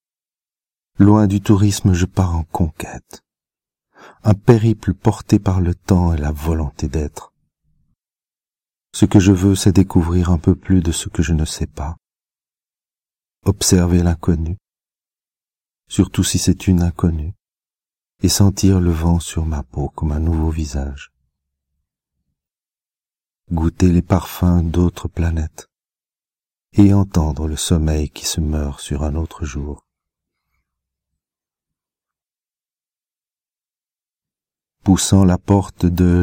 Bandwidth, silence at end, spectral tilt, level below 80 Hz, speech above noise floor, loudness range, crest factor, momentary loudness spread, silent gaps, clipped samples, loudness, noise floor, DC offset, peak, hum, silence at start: 16.5 kHz; 0 s; -6 dB/octave; -30 dBFS; over 74 dB; 8 LU; 18 dB; 13 LU; none; under 0.1%; -17 LUFS; under -90 dBFS; under 0.1%; 0 dBFS; none; 1 s